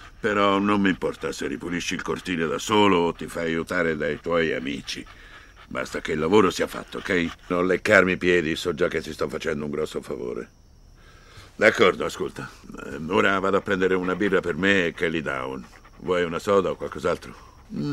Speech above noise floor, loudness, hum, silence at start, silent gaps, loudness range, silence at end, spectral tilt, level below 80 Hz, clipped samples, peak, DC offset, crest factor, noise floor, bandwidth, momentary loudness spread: 27 dB; -24 LUFS; none; 0 s; none; 4 LU; 0 s; -5 dB/octave; -50 dBFS; under 0.1%; -2 dBFS; under 0.1%; 22 dB; -51 dBFS; 15 kHz; 14 LU